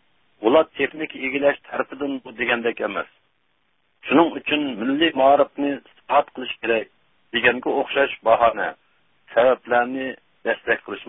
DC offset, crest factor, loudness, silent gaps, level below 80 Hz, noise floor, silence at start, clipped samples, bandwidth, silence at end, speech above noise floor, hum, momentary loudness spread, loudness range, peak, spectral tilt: under 0.1%; 20 dB; -21 LUFS; none; -60 dBFS; -69 dBFS; 0.4 s; under 0.1%; 3.9 kHz; 0.05 s; 48 dB; none; 11 LU; 3 LU; -2 dBFS; -9 dB/octave